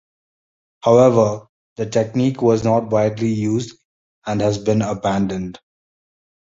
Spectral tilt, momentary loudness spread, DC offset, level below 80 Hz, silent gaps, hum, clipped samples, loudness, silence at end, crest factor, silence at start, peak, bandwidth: -7 dB/octave; 15 LU; under 0.1%; -50 dBFS; 1.49-1.76 s, 3.85-4.22 s; none; under 0.1%; -18 LUFS; 0.95 s; 18 dB; 0.85 s; -2 dBFS; 7.8 kHz